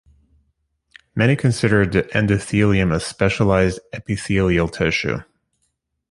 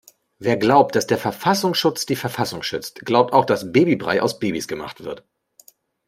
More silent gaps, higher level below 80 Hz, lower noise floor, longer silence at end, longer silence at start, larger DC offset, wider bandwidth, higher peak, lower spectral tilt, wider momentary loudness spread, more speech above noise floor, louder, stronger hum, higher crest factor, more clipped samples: neither; first, -38 dBFS vs -60 dBFS; first, -71 dBFS vs -53 dBFS; about the same, 0.9 s vs 0.9 s; first, 1.15 s vs 0.4 s; neither; second, 11.5 kHz vs 16 kHz; about the same, -2 dBFS vs -2 dBFS; about the same, -6 dB/octave vs -5 dB/octave; second, 9 LU vs 13 LU; first, 53 dB vs 34 dB; about the same, -19 LUFS vs -20 LUFS; neither; about the same, 18 dB vs 18 dB; neither